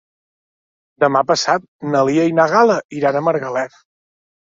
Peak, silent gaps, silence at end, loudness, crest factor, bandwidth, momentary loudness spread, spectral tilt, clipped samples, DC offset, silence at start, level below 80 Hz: -2 dBFS; 1.68-1.79 s, 2.85-2.89 s; 0.85 s; -16 LUFS; 16 dB; 7.8 kHz; 7 LU; -5 dB/octave; under 0.1%; under 0.1%; 1 s; -64 dBFS